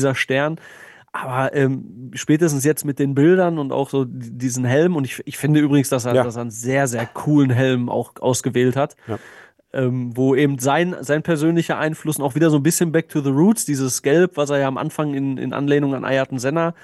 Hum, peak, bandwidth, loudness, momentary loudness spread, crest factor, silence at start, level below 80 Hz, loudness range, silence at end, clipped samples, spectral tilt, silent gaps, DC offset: none; -4 dBFS; 13 kHz; -19 LUFS; 8 LU; 14 dB; 0 s; -64 dBFS; 2 LU; 0.1 s; under 0.1%; -5.5 dB/octave; none; under 0.1%